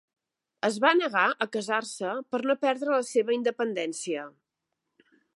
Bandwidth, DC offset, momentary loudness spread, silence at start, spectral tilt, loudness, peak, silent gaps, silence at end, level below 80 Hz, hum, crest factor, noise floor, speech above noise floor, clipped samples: 11.5 kHz; under 0.1%; 10 LU; 0.65 s; -3 dB/octave; -27 LUFS; -6 dBFS; none; 1.05 s; -86 dBFS; none; 22 dB; -84 dBFS; 57 dB; under 0.1%